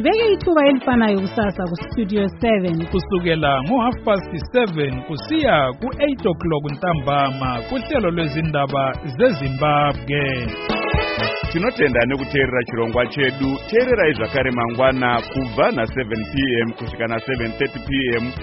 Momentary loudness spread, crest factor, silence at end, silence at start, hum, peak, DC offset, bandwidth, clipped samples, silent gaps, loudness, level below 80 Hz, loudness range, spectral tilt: 7 LU; 16 dB; 0 s; 0 s; none; -2 dBFS; under 0.1%; 6 kHz; under 0.1%; none; -19 LUFS; -36 dBFS; 2 LU; -4.5 dB/octave